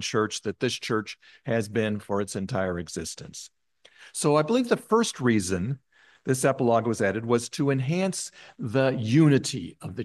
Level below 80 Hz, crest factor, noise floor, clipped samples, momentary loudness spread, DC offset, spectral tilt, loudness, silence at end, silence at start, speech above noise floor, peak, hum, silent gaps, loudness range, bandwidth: -66 dBFS; 18 dB; -55 dBFS; under 0.1%; 15 LU; under 0.1%; -5.5 dB/octave; -26 LUFS; 0 s; 0 s; 29 dB; -8 dBFS; none; none; 5 LU; 12.5 kHz